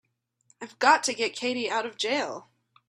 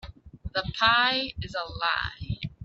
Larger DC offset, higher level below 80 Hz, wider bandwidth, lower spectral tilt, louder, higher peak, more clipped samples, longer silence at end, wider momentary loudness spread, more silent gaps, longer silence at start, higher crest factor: neither; second, -78 dBFS vs -46 dBFS; first, 14 kHz vs 7.8 kHz; second, -1 dB/octave vs -4.5 dB/octave; about the same, -26 LUFS vs -26 LUFS; about the same, -6 dBFS vs -6 dBFS; neither; first, 0.5 s vs 0 s; first, 21 LU vs 14 LU; neither; first, 0.6 s vs 0.05 s; about the same, 22 dB vs 22 dB